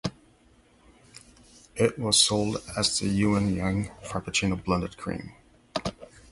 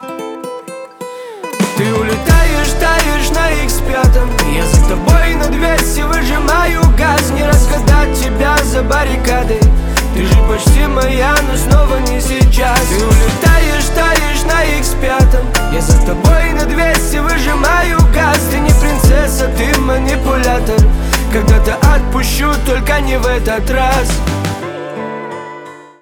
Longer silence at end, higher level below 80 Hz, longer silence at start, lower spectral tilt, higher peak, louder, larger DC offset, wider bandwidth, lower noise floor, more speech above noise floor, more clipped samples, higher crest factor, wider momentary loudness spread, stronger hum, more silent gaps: about the same, 0.25 s vs 0.2 s; second, -48 dBFS vs -12 dBFS; about the same, 0.05 s vs 0 s; second, -3.5 dB/octave vs -5 dB/octave; second, -6 dBFS vs 0 dBFS; second, -26 LUFS vs -12 LUFS; neither; second, 11.5 kHz vs 19.5 kHz; first, -60 dBFS vs -31 dBFS; first, 33 dB vs 22 dB; neither; first, 22 dB vs 10 dB; first, 16 LU vs 7 LU; neither; neither